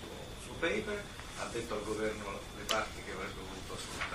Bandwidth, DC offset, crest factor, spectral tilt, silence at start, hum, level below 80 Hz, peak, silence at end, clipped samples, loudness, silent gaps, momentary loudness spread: 15.5 kHz; under 0.1%; 24 dB; -3.5 dB/octave; 0 s; none; -52 dBFS; -16 dBFS; 0 s; under 0.1%; -39 LUFS; none; 10 LU